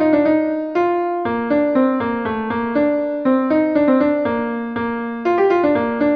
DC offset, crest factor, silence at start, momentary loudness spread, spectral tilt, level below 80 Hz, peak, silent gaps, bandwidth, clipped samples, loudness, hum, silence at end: under 0.1%; 14 dB; 0 s; 7 LU; -8.5 dB/octave; -52 dBFS; -4 dBFS; none; 5.6 kHz; under 0.1%; -18 LUFS; none; 0 s